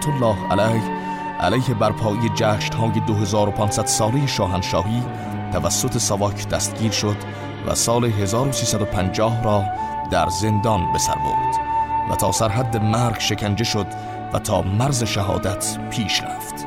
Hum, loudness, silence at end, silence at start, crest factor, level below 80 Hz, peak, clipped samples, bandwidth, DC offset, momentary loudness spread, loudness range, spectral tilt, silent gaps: none; -21 LUFS; 0 s; 0 s; 14 dB; -42 dBFS; -6 dBFS; under 0.1%; 16.5 kHz; under 0.1%; 6 LU; 2 LU; -4.5 dB/octave; none